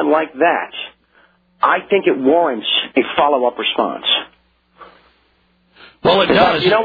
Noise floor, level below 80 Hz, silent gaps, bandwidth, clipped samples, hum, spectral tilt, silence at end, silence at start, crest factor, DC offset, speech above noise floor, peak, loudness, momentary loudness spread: -58 dBFS; -52 dBFS; none; 5 kHz; under 0.1%; none; -7 dB/octave; 0 s; 0 s; 16 dB; under 0.1%; 44 dB; 0 dBFS; -15 LUFS; 8 LU